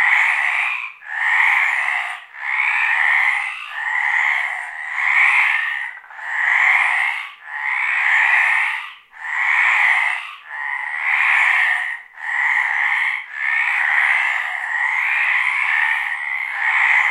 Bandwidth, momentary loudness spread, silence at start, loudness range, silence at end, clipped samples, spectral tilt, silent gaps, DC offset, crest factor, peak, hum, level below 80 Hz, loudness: 14 kHz; 12 LU; 0 s; 1 LU; 0 s; under 0.1%; 4 dB/octave; none; under 0.1%; 16 dB; -2 dBFS; none; -74 dBFS; -16 LUFS